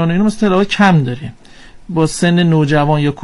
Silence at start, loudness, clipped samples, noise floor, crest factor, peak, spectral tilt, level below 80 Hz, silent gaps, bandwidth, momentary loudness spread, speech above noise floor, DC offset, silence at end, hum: 0 s; -13 LUFS; under 0.1%; -37 dBFS; 12 dB; 0 dBFS; -6.5 dB/octave; -38 dBFS; none; 11.5 kHz; 11 LU; 25 dB; under 0.1%; 0 s; none